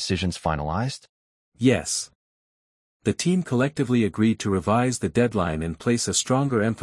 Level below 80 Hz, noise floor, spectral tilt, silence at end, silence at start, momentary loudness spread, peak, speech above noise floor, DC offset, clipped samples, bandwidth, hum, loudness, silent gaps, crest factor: -50 dBFS; under -90 dBFS; -5 dB/octave; 0 s; 0 s; 6 LU; -6 dBFS; over 67 dB; under 0.1%; under 0.1%; 12 kHz; none; -24 LUFS; 1.09-1.52 s, 2.15-3.00 s; 18 dB